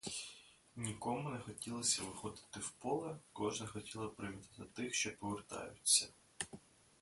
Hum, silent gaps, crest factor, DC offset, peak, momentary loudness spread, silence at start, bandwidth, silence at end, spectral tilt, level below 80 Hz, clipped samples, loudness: none; none; 26 dB; under 0.1%; -18 dBFS; 16 LU; 0.05 s; 12 kHz; 0.45 s; -2.5 dB/octave; -70 dBFS; under 0.1%; -40 LUFS